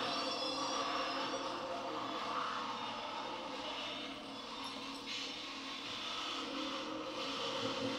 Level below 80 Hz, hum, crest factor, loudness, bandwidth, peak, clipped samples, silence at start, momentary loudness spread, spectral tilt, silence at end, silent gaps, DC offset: -72 dBFS; none; 16 dB; -40 LUFS; 16 kHz; -26 dBFS; under 0.1%; 0 s; 6 LU; -2.5 dB/octave; 0 s; none; under 0.1%